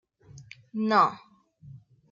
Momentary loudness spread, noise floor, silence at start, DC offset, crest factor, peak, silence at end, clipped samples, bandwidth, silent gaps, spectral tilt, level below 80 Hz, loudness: 26 LU; -51 dBFS; 0.35 s; under 0.1%; 22 dB; -8 dBFS; 0.35 s; under 0.1%; 7.6 kHz; none; -6 dB/octave; -70 dBFS; -25 LUFS